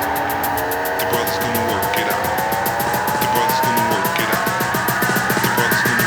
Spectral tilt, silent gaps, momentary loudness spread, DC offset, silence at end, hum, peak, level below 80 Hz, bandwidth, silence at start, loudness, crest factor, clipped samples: -3.5 dB/octave; none; 4 LU; under 0.1%; 0 s; none; -2 dBFS; -48 dBFS; over 20 kHz; 0 s; -18 LUFS; 16 dB; under 0.1%